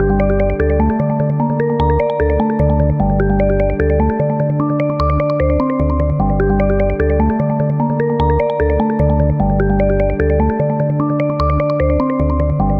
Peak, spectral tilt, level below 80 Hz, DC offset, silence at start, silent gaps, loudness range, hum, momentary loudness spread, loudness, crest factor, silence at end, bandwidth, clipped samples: -2 dBFS; -11 dB/octave; -22 dBFS; under 0.1%; 0 s; none; 0 LU; none; 2 LU; -15 LUFS; 12 dB; 0 s; 5.4 kHz; under 0.1%